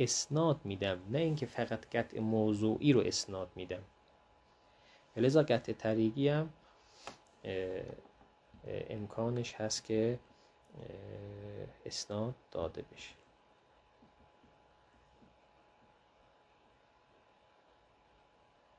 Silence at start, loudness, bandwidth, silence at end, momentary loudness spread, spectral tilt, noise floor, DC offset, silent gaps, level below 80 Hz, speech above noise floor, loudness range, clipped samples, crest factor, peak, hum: 0 s; -35 LUFS; 10.5 kHz; 5.65 s; 20 LU; -5 dB/octave; -68 dBFS; under 0.1%; none; -68 dBFS; 33 dB; 11 LU; under 0.1%; 22 dB; -16 dBFS; none